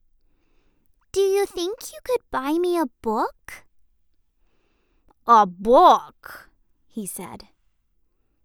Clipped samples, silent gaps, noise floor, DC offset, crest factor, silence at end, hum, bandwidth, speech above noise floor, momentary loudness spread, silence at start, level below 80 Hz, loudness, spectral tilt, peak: under 0.1%; none; -67 dBFS; under 0.1%; 20 dB; 1.1 s; none; 19.5 kHz; 46 dB; 25 LU; 1.15 s; -54 dBFS; -21 LUFS; -4 dB/octave; -4 dBFS